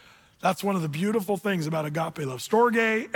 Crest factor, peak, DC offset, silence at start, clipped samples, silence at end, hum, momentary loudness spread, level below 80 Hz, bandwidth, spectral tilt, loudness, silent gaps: 16 dB; -10 dBFS; under 0.1%; 0.45 s; under 0.1%; 0 s; none; 8 LU; -68 dBFS; 19 kHz; -5.5 dB/octave; -26 LUFS; none